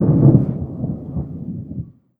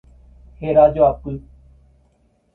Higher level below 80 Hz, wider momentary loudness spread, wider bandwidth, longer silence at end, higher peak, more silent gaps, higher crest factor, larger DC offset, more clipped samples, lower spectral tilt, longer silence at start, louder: about the same, -40 dBFS vs -42 dBFS; about the same, 18 LU vs 18 LU; second, 1.8 kHz vs 4 kHz; second, 0.35 s vs 1.15 s; about the same, 0 dBFS vs -2 dBFS; neither; about the same, 18 dB vs 18 dB; neither; neither; first, -14.5 dB/octave vs -10.5 dB/octave; second, 0 s vs 0.6 s; second, -19 LUFS vs -16 LUFS